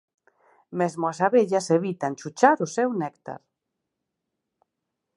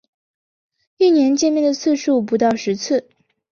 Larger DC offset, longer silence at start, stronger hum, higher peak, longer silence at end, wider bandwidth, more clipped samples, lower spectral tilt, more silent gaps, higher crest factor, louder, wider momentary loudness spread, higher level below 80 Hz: neither; second, 0.7 s vs 1 s; neither; about the same, -2 dBFS vs -4 dBFS; first, 1.8 s vs 0.5 s; first, 11.5 kHz vs 7.2 kHz; neither; about the same, -5.5 dB/octave vs -4.5 dB/octave; neither; first, 24 dB vs 14 dB; second, -24 LUFS vs -17 LUFS; first, 16 LU vs 7 LU; second, -78 dBFS vs -64 dBFS